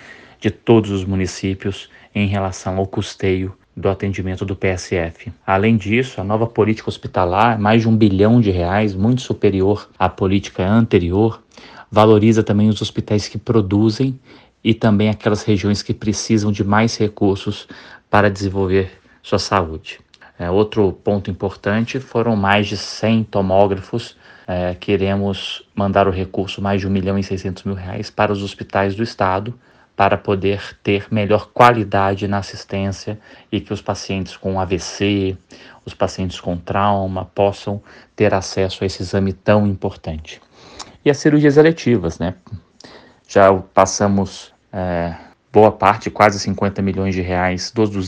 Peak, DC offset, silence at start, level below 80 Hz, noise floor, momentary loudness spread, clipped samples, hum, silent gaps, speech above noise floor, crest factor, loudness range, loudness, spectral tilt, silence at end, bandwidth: 0 dBFS; under 0.1%; 0.05 s; -44 dBFS; -43 dBFS; 13 LU; under 0.1%; none; none; 26 dB; 18 dB; 5 LU; -18 LUFS; -6 dB/octave; 0 s; 9.6 kHz